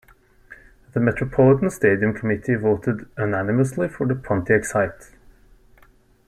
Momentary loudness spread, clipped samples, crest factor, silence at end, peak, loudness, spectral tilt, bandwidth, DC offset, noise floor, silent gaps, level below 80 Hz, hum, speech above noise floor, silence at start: 8 LU; under 0.1%; 18 dB; 1.25 s; -4 dBFS; -21 LUFS; -8 dB/octave; 13.5 kHz; under 0.1%; -54 dBFS; none; -48 dBFS; none; 34 dB; 0.5 s